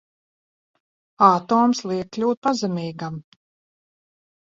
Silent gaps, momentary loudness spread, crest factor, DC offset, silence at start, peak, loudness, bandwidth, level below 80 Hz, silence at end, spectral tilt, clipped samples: 2.37-2.42 s; 15 LU; 24 dB; under 0.1%; 1.2 s; 0 dBFS; -20 LUFS; 7.8 kHz; -66 dBFS; 1.3 s; -6 dB/octave; under 0.1%